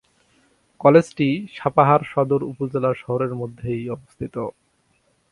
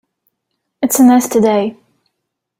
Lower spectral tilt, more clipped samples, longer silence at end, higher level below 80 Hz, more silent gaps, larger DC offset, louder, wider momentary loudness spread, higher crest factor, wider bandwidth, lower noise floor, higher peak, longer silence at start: first, -8 dB/octave vs -4.5 dB/octave; neither; about the same, 0.8 s vs 0.85 s; about the same, -56 dBFS vs -58 dBFS; neither; neither; second, -21 LUFS vs -12 LUFS; first, 16 LU vs 11 LU; first, 22 dB vs 14 dB; second, 11 kHz vs 16.5 kHz; second, -64 dBFS vs -75 dBFS; about the same, 0 dBFS vs -2 dBFS; about the same, 0.8 s vs 0.8 s